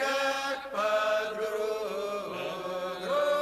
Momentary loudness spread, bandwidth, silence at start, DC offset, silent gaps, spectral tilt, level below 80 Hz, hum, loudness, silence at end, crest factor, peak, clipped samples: 7 LU; 14 kHz; 0 s; under 0.1%; none; -2.5 dB/octave; -68 dBFS; none; -31 LUFS; 0 s; 14 dB; -16 dBFS; under 0.1%